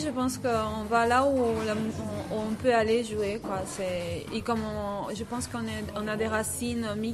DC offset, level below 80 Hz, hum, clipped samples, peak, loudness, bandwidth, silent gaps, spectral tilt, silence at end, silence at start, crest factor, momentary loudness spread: under 0.1%; -50 dBFS; none; under 0.1%; -10 dBFS; -29 LUFS; 14 kHz; none; -5 dB/octave; 0 s; 0 s; 18 dB; 9 LU